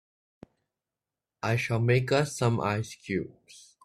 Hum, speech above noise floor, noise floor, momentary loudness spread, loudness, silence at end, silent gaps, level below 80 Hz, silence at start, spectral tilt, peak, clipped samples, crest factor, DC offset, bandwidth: none; 62 dB; -90 dBFS; 9 LU; -28 LUFS; 0.25 s; none; -62 dBFS; 1.45 s; -6 dB/octave; -12 dBFS; under 0.1%; 18 dB; under 0.1%; 13.5 kHz